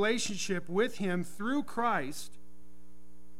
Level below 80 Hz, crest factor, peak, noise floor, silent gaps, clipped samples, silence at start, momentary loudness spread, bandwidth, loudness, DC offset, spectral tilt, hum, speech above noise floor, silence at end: -66 dBFS; 18 dB; -18 dBFS; -60 dBFS; none; under 0.1%; 0 s; 9 LU; 16 kHz; -33 LUFS; 2%; -4 dB/octave; none; 28 dB; 1.1 s